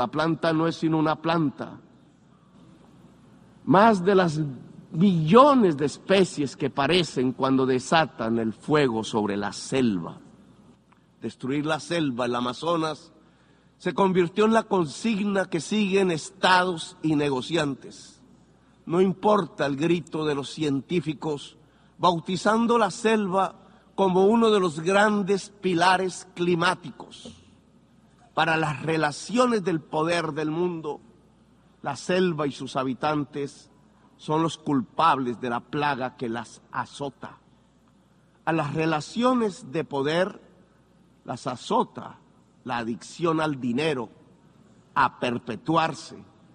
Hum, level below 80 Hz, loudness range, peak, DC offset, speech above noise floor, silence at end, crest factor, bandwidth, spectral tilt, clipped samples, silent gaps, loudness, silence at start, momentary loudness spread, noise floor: none; -62 dBFS; 8 LU; -2 dBFS; under 0.1%; 35 dB; 0.35 s; 24 dB; 10.5 kHz; -5.5 dB/octave; under 0.1%; none; -24 LUFS; 0 s; 14 LU; -59 dBFS